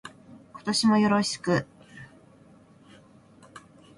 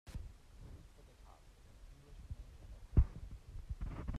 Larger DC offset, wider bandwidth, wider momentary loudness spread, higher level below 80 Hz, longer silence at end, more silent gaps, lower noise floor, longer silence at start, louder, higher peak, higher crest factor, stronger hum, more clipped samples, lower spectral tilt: neither; about the same, 11.5 kHz vs 10.5 kHz; about the same, 26 LU vs 27 LU; second, -66 dBFS vs -44 dBFS; first, 0.4 s vs 0 s; neither; second, -55 dBFS vs -60 dBFS; about the same, 0.05 s vs 0.05 s; first, -24 LUFS vs -42 LUFS; first, -12 dBFS vs -18 dBFS; second, 18 dB vs 24 dB; neither; neither; second, -4.5 dB/octave vs -8 dB/octave